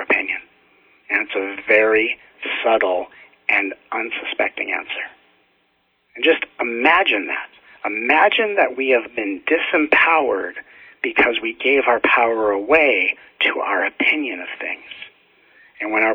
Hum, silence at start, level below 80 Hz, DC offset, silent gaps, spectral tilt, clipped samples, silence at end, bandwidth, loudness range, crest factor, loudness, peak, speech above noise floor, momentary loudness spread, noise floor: none; 0 s; -60 dBFS; under 0.1%; none; -5 dB/octave; under 0.1%; 0 s; 6 kHz; 5 LU; 20 dB; -18 LUFS; 0 dBFS; 46 dB; 13 LU; -64 dBFS